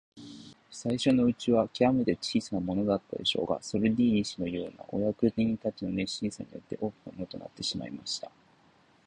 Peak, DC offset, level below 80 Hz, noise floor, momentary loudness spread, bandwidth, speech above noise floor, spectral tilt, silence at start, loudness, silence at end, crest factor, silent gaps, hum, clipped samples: -12 dBFS; under 0.1%; -58 dBFS; -63 dBFS; 15 LU; 10 kHz; 34 dB; -5.5 dB/octave; 0.15 s; -30 LUFS; 0.8 s; 18 dB; none; none; under 0.1%